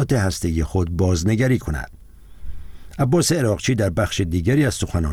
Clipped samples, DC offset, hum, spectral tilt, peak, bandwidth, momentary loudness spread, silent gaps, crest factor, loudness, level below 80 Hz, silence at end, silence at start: under 0.1%; under 0.1%; none; -5.5 dB/octave; -6 dBFS; 16 kHz; 11 LU; none; 14 dB; -20 LUFS; -34 dBFS; 0 s; 0 s